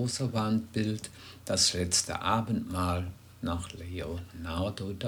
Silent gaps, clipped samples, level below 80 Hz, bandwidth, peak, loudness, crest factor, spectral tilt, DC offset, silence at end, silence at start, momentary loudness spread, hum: none; under 0.1%; -50 dBFS; over 20 kHz; -12 dBFS; -31 LUFS; 20 dB; -4 dB/octave; under 0.1%; 0 s; 0 s; 14 LU; none